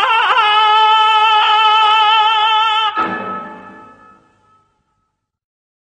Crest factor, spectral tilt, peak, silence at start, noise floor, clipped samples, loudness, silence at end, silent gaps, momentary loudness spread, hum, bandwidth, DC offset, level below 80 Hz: 14 dB; -1.5 dB/octave; -2 dBFS; 0 s; -70 dBFS; under 0.1%; -11 LUFS; 2.15 s; none; 12 LU; none; 9.4 kHz; under 0.1%; -64 dBFS